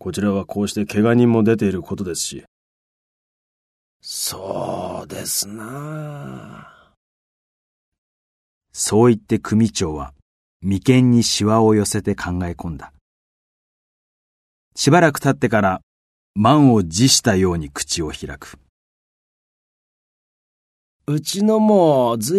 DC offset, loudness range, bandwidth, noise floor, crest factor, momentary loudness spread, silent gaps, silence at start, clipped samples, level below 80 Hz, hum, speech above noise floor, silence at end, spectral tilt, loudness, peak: under 0.1%; 12 LU; 13.5 kHz; under -90 dBFS; 20 dB; 18 LU; 2.48-4.00 s, 6.97-7.92 s, 7.98-8.61 s, 10.22-10.60 s, 13.01-14.71 s, 15.83-16.34 s, 18.69-21.00 s; 0.05 s; under 0.1%; -48 dBFS; none; over 72 dB; 0 s; -5 dB/octave; -18 LUFS; 0 dBFS